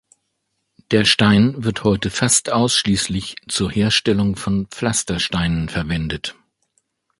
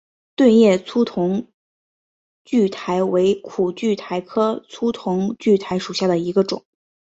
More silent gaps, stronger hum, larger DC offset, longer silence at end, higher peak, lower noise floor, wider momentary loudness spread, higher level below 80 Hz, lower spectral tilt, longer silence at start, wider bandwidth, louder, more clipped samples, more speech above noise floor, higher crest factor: second, none vs 1.54-2.45 s; neither; neither; first, 0.85 s vs 0.55 s; first, 0 dBFS vs -4 dBFS; second, -73 dBFS vs under -90 dBFS; about the same, 9 LU vs 10 LU; first, -40 dBFS vs -62 dBFS; second, -4 dB/octave vs -6.5 dB/octave; first, 0.9 s vs 0.4 s; first, 11.5 kHz vs 8 kHz; about the same, -18 LUFS vs -19 LUFS; neither; second, 54 dB vs over 72 dB; about the same, 20 dB vs 16 dB